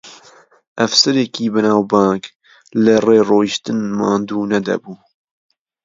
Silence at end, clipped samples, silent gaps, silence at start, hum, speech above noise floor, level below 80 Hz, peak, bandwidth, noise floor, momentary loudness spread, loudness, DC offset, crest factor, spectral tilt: 0.9 s; under 0.1%; 0.67-0.75 s, 2.36-2.40 s; 0.05 s; none; 32 dB; -58 dBFS; 0 dBFS; 7.8 kHz; -47 dBFS; 11 LU; -15 LUFS; under 0.1%; 16 dB; -4.5 dB/octave